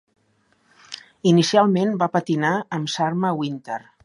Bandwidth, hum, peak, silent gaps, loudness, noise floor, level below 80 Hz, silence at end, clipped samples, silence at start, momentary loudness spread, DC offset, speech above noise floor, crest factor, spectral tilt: 11.5 kHz; none; -4 dBFS; none; -21 LUFS; -64 dBFS; -68 dBFS; 0.25 s; under 0.1%; 0.9 s; 16 LU; under 0.1%; 44 dB; 18 dB; -5.5 dB/octave